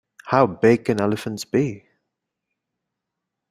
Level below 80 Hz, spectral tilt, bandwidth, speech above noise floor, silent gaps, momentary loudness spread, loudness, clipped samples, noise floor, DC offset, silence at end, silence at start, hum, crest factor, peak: -60 dBFS; -6.5 dB/octave; 15.5 kHz; 63 dB; none; 8 LU; -21 LUFS; under 0.1%; -82 dBFS; under 0.1%; 1.7 s; 0.25 s; none; 22 dB; -2 dBFS